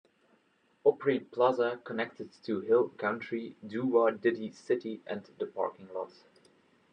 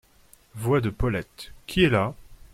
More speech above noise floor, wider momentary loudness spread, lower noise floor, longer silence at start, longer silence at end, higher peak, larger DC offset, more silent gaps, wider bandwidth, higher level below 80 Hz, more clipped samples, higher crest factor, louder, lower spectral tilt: first, 39 dB vs 32 dB; second, 13 LU vs 20 LU; first, -70 dBFS vs -57 dBFS; first, 0.85 s vs 0.55 s; first, 0.85 s vs 0.2 s; second, -12 dBFS vs -8 dBFS; neither; neither; second, 8.6 kHz vs 16 kHz; second, -88 dBFS vs -40 dBFS; neither; about the same, 20 dB vs 18 dB; second, -32 LUFS vs -25 LUFS; about the same, -7 dB/octave vs -6.5 dB/octave